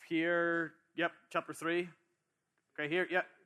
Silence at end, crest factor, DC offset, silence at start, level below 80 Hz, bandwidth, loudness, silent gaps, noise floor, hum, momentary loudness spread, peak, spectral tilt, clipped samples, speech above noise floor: 0.2 s; 18 dB; under 0.1%; 0 s; -90 dBFS; 13.5 kHz; -35 LUFS; none; -83 dBFS; none; 10 LU; -18 dBFS; -5 dB/octave; under 0.1%; 48 dB